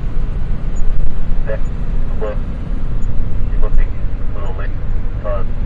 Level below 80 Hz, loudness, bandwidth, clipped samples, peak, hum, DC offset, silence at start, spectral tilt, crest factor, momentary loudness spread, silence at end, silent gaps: -16 dBFS; -23 LUFS; 3.1 kHz; under 0.1%; 0 dBFS; none; under 0.1%; 0 s; -8.5 dB/octave; 10 dB; 4 LU; 0 s; none